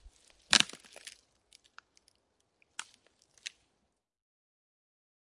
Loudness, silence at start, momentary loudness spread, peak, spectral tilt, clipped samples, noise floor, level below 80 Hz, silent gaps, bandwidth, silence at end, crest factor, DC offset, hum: -27 LUFS; 0.5 s; 24 LU; -4 dBFS; 0.5 dB/octave; under 0.1%; -80 dBFS; -72 dBFS; none; 11.5 kHz; 1.7 s; 36 dB; under 0.1%; none